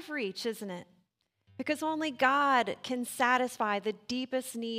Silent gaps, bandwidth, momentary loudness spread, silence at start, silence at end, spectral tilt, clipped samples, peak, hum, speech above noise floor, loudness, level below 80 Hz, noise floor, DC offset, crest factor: none; 16 kHz; 11 LU; 0 s; 0 s; -3 dB/octave; under 0.1%; -12 dBFS; none; 44 dB; -31 LUFS; -80 dBFS; -75 dBFS; under 0.1%; 20 dB